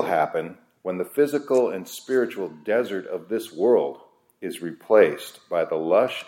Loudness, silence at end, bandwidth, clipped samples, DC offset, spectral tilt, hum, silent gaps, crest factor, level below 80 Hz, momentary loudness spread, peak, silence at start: -24 LUFS; 0.05 s; 16.5 kHz; under 0.1%; under 0.1%; -5 dB/octave; none; none; 18 dB; -76 dBFS; 14 LU; -4 dBFS; 0 s